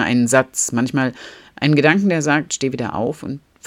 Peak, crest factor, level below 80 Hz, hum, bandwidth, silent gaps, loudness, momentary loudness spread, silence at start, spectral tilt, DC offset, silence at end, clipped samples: 0 dBFS; 18 dB; -56 dBFS; none; 16 kHz; none; -18 LUFS; 14 LU; 0 s; -4.5 dB/octave; under 0.1%; 0.3 s; under 0.1%